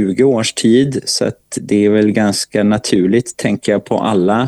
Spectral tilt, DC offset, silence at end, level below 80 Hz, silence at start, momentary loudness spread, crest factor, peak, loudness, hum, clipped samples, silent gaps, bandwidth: -5 dB/octave; under 0.1%; 0 s; -50 dBFS; 0 s; 5 LU; 14 dB; 0 dBFS; -14 LUFS; none; under 0.1%; none; 12.5 kHz